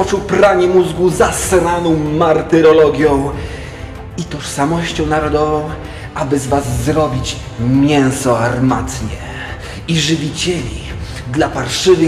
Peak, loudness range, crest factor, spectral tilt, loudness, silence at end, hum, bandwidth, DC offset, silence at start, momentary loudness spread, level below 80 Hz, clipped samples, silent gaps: 0 dBFS; 6 LU; 14 dB; -5 dB/octave; -14 LUFS; 0 s; none; 15 kHz; under 0.1%; 0 s; 15 LU; -32 dBFS; under 0.1%; none